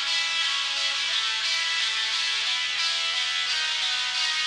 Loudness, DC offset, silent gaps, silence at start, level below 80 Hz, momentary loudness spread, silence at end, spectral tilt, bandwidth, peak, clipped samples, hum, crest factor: -23 LUFS; under 0.1%; none; 0 s; -68 dBFS; 1 LU; 0 s; 3.5 dB/octave; 13 kHz; -12 dBFS; under 0.1%; none; 14 dB